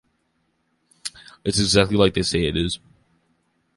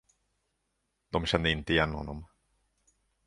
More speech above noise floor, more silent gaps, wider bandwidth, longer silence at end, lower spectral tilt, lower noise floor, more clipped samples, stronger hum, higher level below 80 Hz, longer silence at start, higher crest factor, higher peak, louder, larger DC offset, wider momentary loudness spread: about the same, 50 dB vs 50 dB; neither; about the same, 11.5 kHz vs 11.5 kHz; about the same, 1 s vs 1 s; about the same, -4.5 dB/octave vs -5.5 dB/octave; second, -69 dBFS vs -80 dBFS; neither; neither; first, -40 dBFS vs -46 dBFS; about the same, 1.05 s vs 1.1 s; about the same, 22 dB vs 26 dB; first, -2 dBFS vs -8 dBFS; first, -20 LUFS vs -29 LUFS; neither; first, 17 LU vs 14 LU